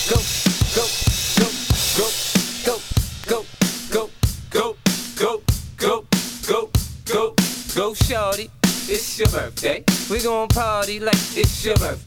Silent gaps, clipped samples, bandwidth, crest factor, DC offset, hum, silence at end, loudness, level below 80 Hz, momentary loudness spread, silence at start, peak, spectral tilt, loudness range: none; under 0.1%; 19.5 kHz; 18 dB; under 0.1%; none; 0 s; -20 LUFS; -30 dBFS; 6 LU; 0 s; -2 dBFS; -4 dB/octave; 2 LU